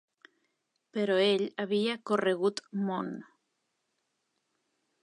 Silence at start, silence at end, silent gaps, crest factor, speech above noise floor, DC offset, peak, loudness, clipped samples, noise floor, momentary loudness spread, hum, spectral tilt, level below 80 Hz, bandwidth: 0.95 s; 1.8 s; none; 20 dB; 51 dB; under 0.1%; -14 dBFS; -30 LUFS; under 0.1%; -80 dBFS; 12 LU; none; -5.5 dB/octave; -84 dBFS; 11 kHz